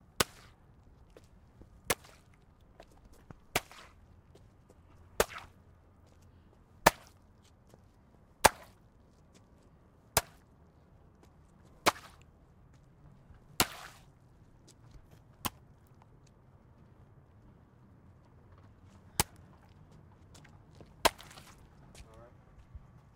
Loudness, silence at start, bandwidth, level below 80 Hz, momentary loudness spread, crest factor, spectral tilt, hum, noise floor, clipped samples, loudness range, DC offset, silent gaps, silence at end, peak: -33 LUFS; 0.2 s; 16 kHz; -58 dBFS; 30 LU; 36 dB; -2 dB/octave; none; -62 dBFS; under 0.1%; 11 LU; under 0.1%; none; 2.05 s; -4 dBFS